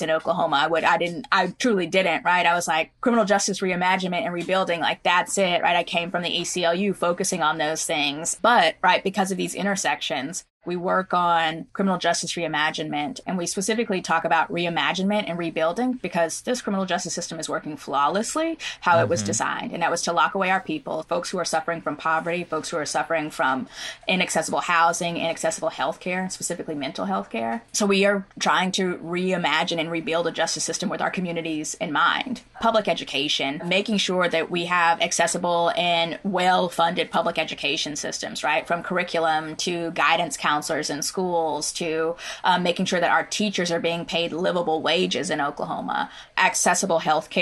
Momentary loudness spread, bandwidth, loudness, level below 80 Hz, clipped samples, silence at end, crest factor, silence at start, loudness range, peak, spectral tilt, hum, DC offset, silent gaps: 7 LU; 12.5 kHz; -23 LUFS; -62 dBFS; under 0.1%; 0 s; 20 dB; 0 s; 3 LU; -4 dBFS; -3 dB/octave; none; under 0.1%; 10.50-10.61 s